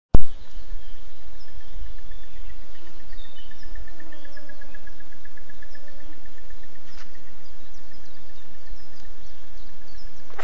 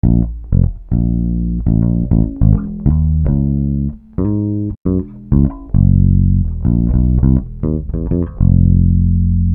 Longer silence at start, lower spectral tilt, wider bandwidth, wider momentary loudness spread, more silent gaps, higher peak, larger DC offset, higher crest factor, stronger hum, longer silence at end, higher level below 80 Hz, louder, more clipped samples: about the same, 0.1 s vs 0.05 s; second, -6.5 dB/octave vs -16 dB/octave; first, 7.2 kHz vs 1.9 kHz; about the same, 7 LU vs 7 LU; second, none vs 4.77-4.85 s; about the same, 0 dBFS vs 0 dBFS; first, 20% vs under 0.1%; first, 20 dB vs 12 dB; neither; first, 0.3 s vs 0 s; second, -38 dBFS vs -18 dBFS; second, -42 LUFS vs -15 LUFS; first, 0.3% vs under 0.1%